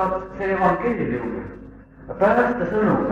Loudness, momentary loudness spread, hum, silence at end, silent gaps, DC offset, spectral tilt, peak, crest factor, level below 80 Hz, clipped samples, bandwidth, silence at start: -21 LUFS; 17 LU; none; 0 s; none; under 0.1%; -8.5 dB/octave; -6 dBFS; 16 dB; -44 dBFS; under 0.1%; 8.2 kHz; 0 s